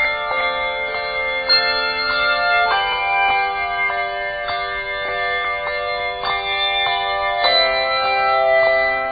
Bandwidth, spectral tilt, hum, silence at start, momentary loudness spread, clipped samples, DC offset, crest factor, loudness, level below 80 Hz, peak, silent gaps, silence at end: 5 kHz; 2.5 dB/octave; none; 0 s; 8 LU; under 0.1%; under 0.1%; 18 dB; -18 LUFS; -46 dBFS; 0 dBFS; none; 0 s